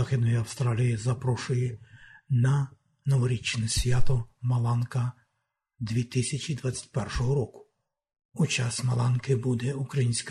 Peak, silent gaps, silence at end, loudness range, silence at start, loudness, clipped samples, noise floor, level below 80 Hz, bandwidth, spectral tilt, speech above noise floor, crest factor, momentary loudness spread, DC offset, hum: -10 dBFS; 8.25-8.29 s; 0 s; 3 LU; 0 s; -28 LUFS; under 0.1%; -80 dBFS; -42 dBFS; 12.5 kHz; -5.5 dB/octave; 54 dB; 16 dB; 7 LU; under 0.1%; none